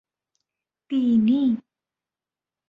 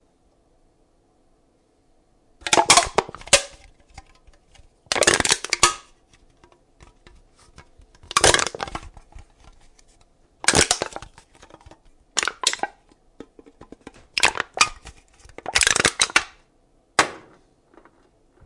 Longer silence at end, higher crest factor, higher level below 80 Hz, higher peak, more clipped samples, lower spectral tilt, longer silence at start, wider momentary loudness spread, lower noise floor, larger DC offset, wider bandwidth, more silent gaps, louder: second, 1.1 s vs 1.3 s; second, 14 dB vs 26 dB; second, -66 dBFS vs -48 dBFS; second, -12 dBFS vs 0 dBFS; neither; first, -9 dB/octave vs -0.5 dB/octave; second, 0.9 s vs 2.45 s; second, 9 LU vs 17 LU; first, under -90 dBFS vs -62 dBFS; neither; second, 4.7 kHz vs 11.5 kHz; neither; second, -22 LUFS vs -19 LUFS